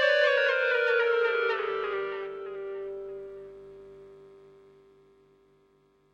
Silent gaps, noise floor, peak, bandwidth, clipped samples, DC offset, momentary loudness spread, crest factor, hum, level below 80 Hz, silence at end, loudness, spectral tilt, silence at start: none; -65 dBFS; -12 dBFS; 7.6 kHz; under 0.1%; under 0.1%; 24 LU; 18 dB; none; -72 dBFS; 1.75 s; -27 LUFS; -2.5 dB/octave; 0 s